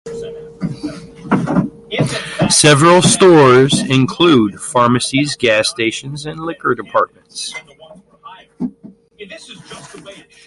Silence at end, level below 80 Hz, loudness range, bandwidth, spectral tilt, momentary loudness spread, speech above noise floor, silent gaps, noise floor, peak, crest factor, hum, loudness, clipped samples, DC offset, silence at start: 0.35 s; -48 dBFS; 13 LU; 11.5 kHz; -4.5 dB/octave; 24 LU; 29 dB; none; -42 dBFS; 0 dBFS; 14 dB; none; -13 LUFS; under 0.1%; under 0.1%; 0.05 s